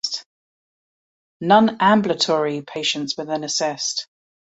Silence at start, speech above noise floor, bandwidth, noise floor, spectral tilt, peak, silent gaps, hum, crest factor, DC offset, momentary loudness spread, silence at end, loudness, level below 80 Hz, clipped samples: 0.05 s; over 71 dB; 8.2 kHz; under -90 dBFS; -3.5 dB/octave; -2 dBFS; 0.26-1.40 s; none; 20 dB; under 0.1%; 11 LU; 0.55 s; -20 LUFS; -64 dBFS; under 0.1%